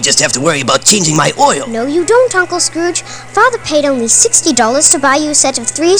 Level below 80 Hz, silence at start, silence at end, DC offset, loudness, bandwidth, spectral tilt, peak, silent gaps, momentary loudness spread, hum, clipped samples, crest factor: -46 dBFS; 0 s; 0 s; 1%; -10 LUFS; 11 kHz; -2 dB/octave; 0 dBFS; none; 8 LU; none; 0.9%; 10 dB